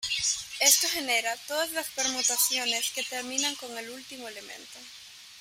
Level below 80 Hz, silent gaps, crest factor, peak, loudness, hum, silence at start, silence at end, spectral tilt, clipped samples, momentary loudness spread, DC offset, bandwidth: -68 dBFS; none; 24 dB; -6 dBFS; -26 LUFS; none; 0 s; 0 s; 1.5 dB/octave; under 0.1%; 21 LU; under 0.1%; 16 kHz